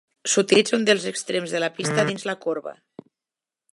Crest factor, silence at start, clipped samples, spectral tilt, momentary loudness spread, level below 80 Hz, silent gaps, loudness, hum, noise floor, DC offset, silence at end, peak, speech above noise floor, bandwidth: 20 dB; 0.25 s; under 0.1%; -3 dB/octave; 10 LU; -74 dBFS; none; -22 LUFS; none; -89 dBFS; under 0.1%; 1 s; -4 dBFS; 67 dB; 11.5 kHz